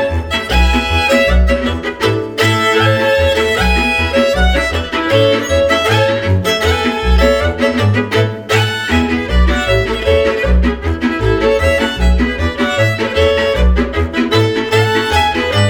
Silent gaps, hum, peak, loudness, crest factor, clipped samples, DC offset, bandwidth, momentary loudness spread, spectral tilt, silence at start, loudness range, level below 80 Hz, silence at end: none; none; 0 dBFS; -13 LUFS; 12 dB; under 0.1%; under 0.1%; 17.5 kHz; 4 LU; -5.5 dB/octave; 0 s; 1 LU; -20 dBFS; 0 s